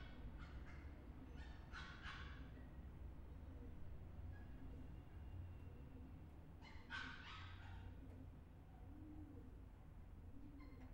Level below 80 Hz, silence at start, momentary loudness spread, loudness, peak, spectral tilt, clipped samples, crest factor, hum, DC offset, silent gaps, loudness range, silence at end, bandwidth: -60 dBFS; 0 s; 7 LU; -58 LUFS; -38 dBFS; -6 dB/octave; under 0.1%; 18 dB; none; under 0.1%; none; 2 LU; 0 s; 16 kHz